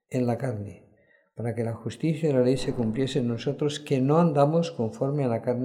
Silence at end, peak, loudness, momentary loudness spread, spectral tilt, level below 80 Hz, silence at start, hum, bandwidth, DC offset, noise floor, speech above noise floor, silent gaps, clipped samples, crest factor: 0 s; -8 dBFS; -26 LUFS; 11 LU; -7.5 dB/octave; -56 dBFS; 0.1 s; none; 12 kHz; under 0.1%; -62 dBFS; 37 dB; none; under 0.1%; 18 dB